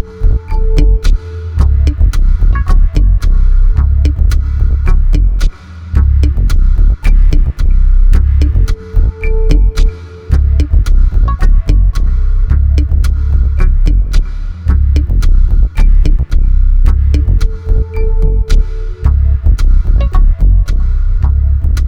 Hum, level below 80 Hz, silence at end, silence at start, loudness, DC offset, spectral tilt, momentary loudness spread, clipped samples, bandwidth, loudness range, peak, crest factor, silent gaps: none; -8 dBFS; 0 s; 0 s; -13 LUFS; under 0.1%; -7.5 dB/octave; 5 LU; 1%; 6.6 kHz; 1 LU; 0 dBFS; 8 dB; none